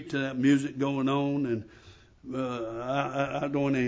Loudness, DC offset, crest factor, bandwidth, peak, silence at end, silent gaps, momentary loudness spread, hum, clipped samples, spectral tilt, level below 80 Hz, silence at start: -29 LUFS; under 0.1%; 16 dB; 8 kHz; -12 dBFS; 0 s; none; 10 LU; none; under 0.1%; -7 dB/octave; -62 dBFS; 0 s